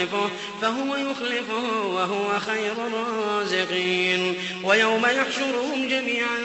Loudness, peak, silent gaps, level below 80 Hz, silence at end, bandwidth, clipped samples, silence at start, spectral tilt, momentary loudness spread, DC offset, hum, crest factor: -23 LUFS; -6 dBFS; none; -68 dBFS; 0 s; 8.4 kHz; under 0.1%; 0 s; -3.5 dB/octave; 7 LU; under 0.1%; none; 18 dB